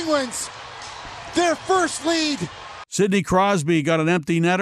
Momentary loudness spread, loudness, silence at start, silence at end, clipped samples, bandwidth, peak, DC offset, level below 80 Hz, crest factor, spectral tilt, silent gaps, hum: 16 LU; -21 LUFS; 0 s; 0 s; under 0.1%; 14 kHz; -6 dBFS; under 0.1%; -52 dBFS; 16 dB; -4.5 dB/octave; none; none